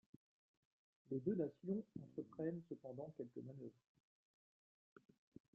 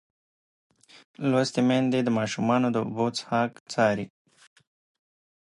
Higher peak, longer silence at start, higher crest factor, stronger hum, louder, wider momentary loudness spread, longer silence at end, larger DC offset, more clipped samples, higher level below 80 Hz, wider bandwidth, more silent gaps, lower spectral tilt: second, -28 dBFS vs -10 dBFS; about the same, 1.1 s vs 1.2 s; about the same, 22 dB vs 18 dB; neither; second, -48 LUFS vs -26 LUFS; first, 14 LU vs 6 LU; first, 1.8 s vs 1.4 s; neither; neither; second, -86 dBFS vs -70 dBFS; second, 5 kHz vs 11 kHz; second, none vs 3.60-3.66 s; first, -11 dB/octave vs -5.5 dB/octave